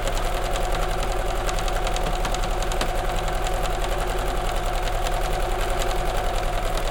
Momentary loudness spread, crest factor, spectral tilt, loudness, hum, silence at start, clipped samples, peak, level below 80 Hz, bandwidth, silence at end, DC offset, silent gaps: 1 LU; 14 dB; -4 dB/octave; -26 LUFS; none; 0 s; under 0.1%; -8 dBFS; -26 dBFS; 17 kHz; 0 s; under 0.1%; none